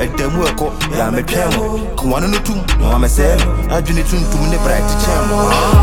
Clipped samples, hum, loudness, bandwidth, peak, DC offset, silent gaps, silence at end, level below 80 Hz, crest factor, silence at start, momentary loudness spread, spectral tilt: under 0.1%; none; -15 LUFS; 17.5 kHz; 0 dBFS; under 0.1%; none; 0 s; -16 dBFS; 12 dB; 0 s; 5 LU; -5 dB/octave